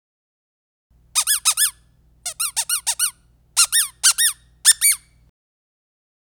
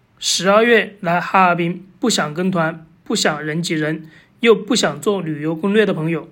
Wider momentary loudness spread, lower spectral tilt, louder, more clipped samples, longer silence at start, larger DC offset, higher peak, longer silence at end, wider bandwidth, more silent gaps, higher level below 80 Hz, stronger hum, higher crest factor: about the same, 8 LU vs 9 LU; second, 5 dB/octave vs -4 dB/octave; about the same, -17 LUFS vs -17 LUFS; neither; first, 1.15 s vs 0.2 s; neither; about the same, 0 dBFS vs 0 dBFS; first, 1.25 s vs 0.05 s; first, over 20 kHz vs 16.5 kHz; neither; about the same, -58 dBFS vs -62 dBFS; first, 60 Hz at -65 dBFS vs none; first, 22 dB vs 16 dB